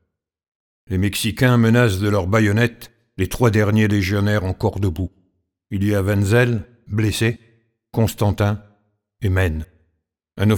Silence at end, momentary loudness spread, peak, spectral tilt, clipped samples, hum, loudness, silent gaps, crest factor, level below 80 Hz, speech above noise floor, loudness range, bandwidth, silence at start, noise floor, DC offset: 0 s; 12 LU; -2 dBFS; -6.5 dB/octave; under 0.1%; none; -19 LUFS; none; 18 dB; -40 dBFS; 54 dB; 5 LU; 18.5 kHz; 0.9 s; -71 dBFS; under 0.1%